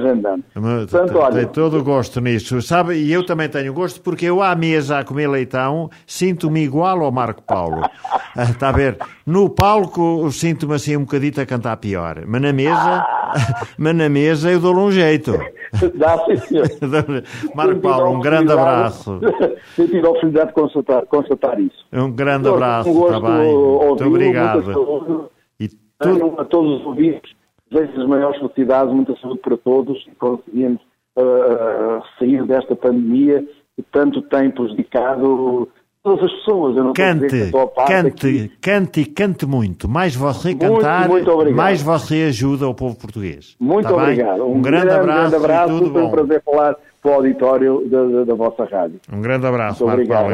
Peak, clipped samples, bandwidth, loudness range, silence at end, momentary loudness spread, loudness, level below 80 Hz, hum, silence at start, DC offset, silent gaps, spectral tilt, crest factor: 0 dBFS; under 0.1%; 15 kHz; 4 LU; 0 s; 8 LU; -16 LUFS; -44 dBFS; none; 0 s; under 0.1%; none; -7 dB/octave; 16 dB